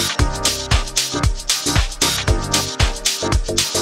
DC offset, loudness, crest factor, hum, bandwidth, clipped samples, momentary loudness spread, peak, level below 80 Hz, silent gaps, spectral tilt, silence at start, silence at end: under 0.1%; -18 LUFS; 16 dB; none; 16.5 kHz; under 0.1%; 3 LU; -2 dBFS; -24 dBFS; none; -2.5 dB/octave; 0 s; 0 s